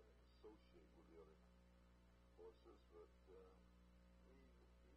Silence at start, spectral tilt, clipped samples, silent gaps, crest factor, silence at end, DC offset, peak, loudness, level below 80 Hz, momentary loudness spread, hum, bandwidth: 0 s; -6 dB/octave; under 0.1%; none; 16 dB; 0 s; under 0.1%; -52 dBFS; -68 LUFS; -74 dBFS; 2 LU; 60 Hz at -70 dBFS; 8 kHz